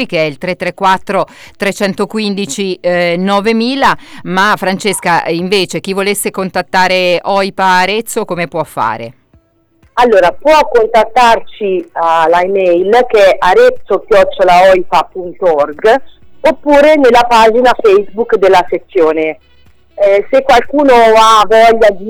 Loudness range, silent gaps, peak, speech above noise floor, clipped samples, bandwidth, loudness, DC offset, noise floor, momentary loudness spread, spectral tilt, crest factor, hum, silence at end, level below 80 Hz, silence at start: 4 LU; none; -2 dBFS; 41 dB; under 0.1%; over 20 kHz; -10 LUFS; under 0.1%; -50 dBFS; 10 LU; -4 dB/octave; 8 dB; none; 0 s; -40 dBFS; 0 s